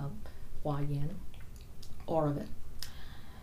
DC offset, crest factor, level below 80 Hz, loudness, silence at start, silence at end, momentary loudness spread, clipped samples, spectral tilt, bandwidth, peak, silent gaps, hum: under 0.1%; 16 dB; -44 dBFS; -38 LUFS; 0 s; 0 s; 19 LU; under 0.1%; -7 dB/octave; 15.5 kHz; -18 dBFS; none; none